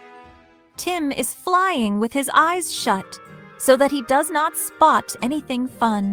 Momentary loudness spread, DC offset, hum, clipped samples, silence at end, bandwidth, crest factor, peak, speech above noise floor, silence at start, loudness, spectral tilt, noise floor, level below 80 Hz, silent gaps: 9 LU; under 0.1%; none; under 0.1%; 0 s; over 20 kHz; 18 dB; -2 dBFS; 31 dB; 0.05 s; -20 LUFS; -3.5 dB/octave; -51 dBFS; -58 dBFS; none